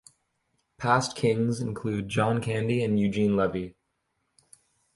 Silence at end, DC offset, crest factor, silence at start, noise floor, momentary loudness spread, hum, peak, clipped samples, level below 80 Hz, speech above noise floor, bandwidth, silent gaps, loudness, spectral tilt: 1.25 s; under 0.1%; 22 dB; 0.8 s; -77 dBFS; 7 LU; none; -6 dBFS; under 0.1%; -56 dBFS; 51 dB; 11.5 kHz; none; -27 LUFS; -6 dB/octave